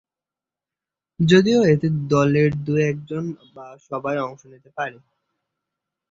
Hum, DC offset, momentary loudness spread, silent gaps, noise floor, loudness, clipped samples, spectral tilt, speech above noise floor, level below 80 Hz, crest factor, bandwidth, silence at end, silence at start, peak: none; under 0.1%; 16 LU; none; -89 dBFS; -20 LUFS; under 0.1%; -7 dB/octave; 69 dB; -54 dBFS; 20 dB; 7.8 kHz; 1.2 s; 1.2 s; -2 dBFS